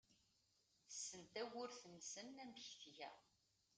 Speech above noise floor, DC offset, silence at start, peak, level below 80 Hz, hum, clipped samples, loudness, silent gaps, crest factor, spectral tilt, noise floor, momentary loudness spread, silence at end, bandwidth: 27 dB; under 0.1%; 0.1 s; -36 dBFS; under -90 dBFS; none; under 0.1%; -54 LUFS; none; 20 dB; -1.5 dB/octave; -82 dBFS; 6 LU; 0.5 s; 9.6 kHz